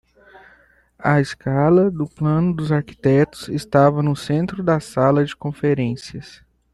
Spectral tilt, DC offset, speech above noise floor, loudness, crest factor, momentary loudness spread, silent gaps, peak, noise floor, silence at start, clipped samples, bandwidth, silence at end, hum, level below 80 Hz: -7.5 dB/octave; under 0.1%; 36 dB; -19 LUFS; 16 dB; 9 LU; none; -2 dBFS; -54 dBFS; 1 s; under 0.1%; 12 kHz; 0.4 s; none; -50 dBFS